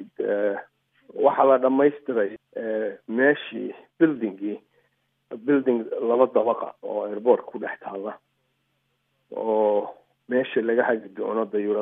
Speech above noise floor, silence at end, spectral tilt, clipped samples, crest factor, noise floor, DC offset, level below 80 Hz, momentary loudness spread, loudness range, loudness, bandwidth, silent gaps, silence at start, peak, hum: 49 dB; 0 s; -9.5 dB/octave; under 0.1%; 20 dB; -72 dBFS; under 0.1%; -84 dBFS; 14 LU; 5 LU; -24 LUFS; 3.8 kHz; none; 0 s; -4 dBFS; none